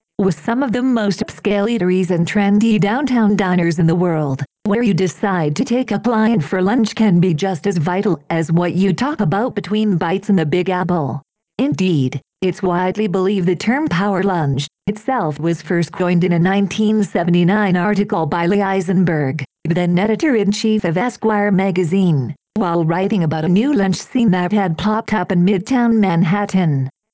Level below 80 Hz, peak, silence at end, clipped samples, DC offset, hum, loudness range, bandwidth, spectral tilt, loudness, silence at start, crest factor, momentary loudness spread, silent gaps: -50 dBFS; -4 dBFS; 0.25 s; under 0.1%; under 0.1%; none; 2 LU; 8 kHz; -7 dB/octave; -17 LUFS; 0.2 s; 12 dB; 5 LU; none